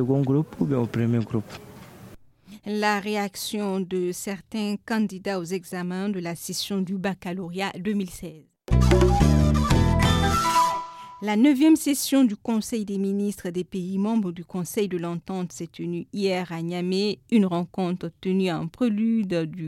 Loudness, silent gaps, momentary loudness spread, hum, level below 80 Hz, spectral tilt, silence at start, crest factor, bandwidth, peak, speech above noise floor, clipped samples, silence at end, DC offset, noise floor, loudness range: -25 LUFS; none; 12 LU; none; -34 dBFS; -6 dB/octave; 0 s; 18 dB; 16.5 kHz; -6 dBFS; 23 dB; under 0.1%; 0 s; under 0.1%; -48 dBFS; 8 LU